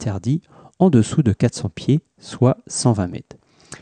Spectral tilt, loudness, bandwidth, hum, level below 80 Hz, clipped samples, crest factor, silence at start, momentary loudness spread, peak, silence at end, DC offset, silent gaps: -6.5 dB/octave; -19 LUFS; 10 kHz; none; -50 dBFS; under 0.1%; 16 dB; 0 s; 10 LU; -4 dBFS; 0.05 s; under 0.1%; none